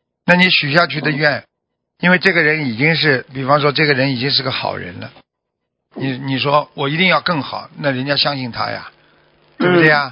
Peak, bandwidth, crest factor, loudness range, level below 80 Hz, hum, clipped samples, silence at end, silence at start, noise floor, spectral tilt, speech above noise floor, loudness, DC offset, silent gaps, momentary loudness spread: 0 dBFS; 8 kHz; 16 dB; 4 LU; -56 dBFS; none; under 0.1%; 0 s; 0.25 s; -76 dBFS; -7 dB/octave; 61 dB; -15 LUFS; under 0.1%; none; 12 LU